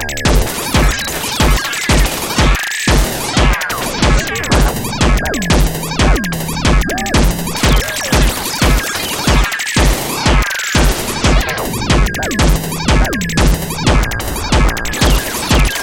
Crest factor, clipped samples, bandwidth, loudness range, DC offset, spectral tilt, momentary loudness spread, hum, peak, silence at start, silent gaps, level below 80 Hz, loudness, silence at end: 12 dB; under 0.1%; 17.5 kHz; 1 LU; under 0.1%; -4 dB/octave; 3 LU; none; 0 dBFS; 0 s; none; -16 dBFS; -14 LUFS; 0 s